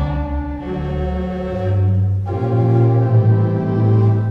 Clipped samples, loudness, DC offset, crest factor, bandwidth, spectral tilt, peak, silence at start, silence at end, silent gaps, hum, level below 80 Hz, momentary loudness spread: under 0.1%; -17 LUFS; under 0.1%; 12 dB; 4.2 kHz; -11 dB/octave; -4 dBFS; 0 s; 0 s; none; none; -30 dBFS; 9 LU